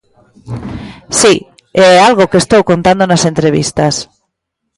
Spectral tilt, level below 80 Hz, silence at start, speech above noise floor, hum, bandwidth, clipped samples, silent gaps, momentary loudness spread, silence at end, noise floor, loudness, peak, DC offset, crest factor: -4 dB/octave; -40 dBFS; 0.45 s; 63 dB; none; 11.5 kHz; under 0.1%; none; 19 LU; 0.75 s; -72 dBFS; -9 LUFS; 0 dBFS; under 0.1%; 10 dB